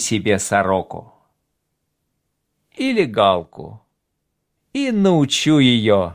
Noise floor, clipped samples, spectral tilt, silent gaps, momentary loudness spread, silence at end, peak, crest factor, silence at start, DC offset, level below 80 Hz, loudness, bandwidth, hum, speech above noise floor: -74 dBFS; under 0.1%; -4.5 dB/octave; none; 18 LU; 0 s; -2 dBFS; 18 dB; 0 s; under 0.1%; -50 dBFS; -17 LUFS; 16 kHz; none; 57 dB